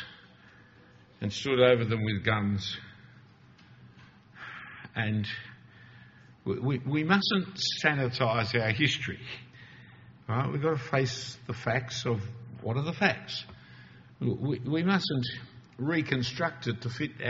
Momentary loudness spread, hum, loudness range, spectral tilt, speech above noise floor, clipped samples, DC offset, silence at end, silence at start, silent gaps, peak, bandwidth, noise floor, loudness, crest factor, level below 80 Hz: 17 LU; none; 8 LU; -4 dB/octave; 27 dB; under 0.1%; under 0.1%; 0 s; 0 s; none; -6 dBFS; 7.6 kHz; -57 dBFS; -30 LUFS; 24 dB; -62 dBFS